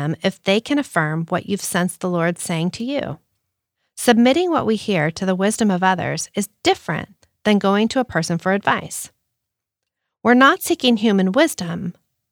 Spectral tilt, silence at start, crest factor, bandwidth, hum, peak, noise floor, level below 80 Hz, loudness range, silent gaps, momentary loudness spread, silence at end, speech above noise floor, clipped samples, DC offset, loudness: -4.5 dB/octave; 0 s; 18 dB; over 20 kHz; none; -2 dBFS; -81 dBFS; -60 dBFS; 3 LU; none; 12 LU; 0.4 s; 63 dB; under 0.1%; under 0.1%; -19 LUFS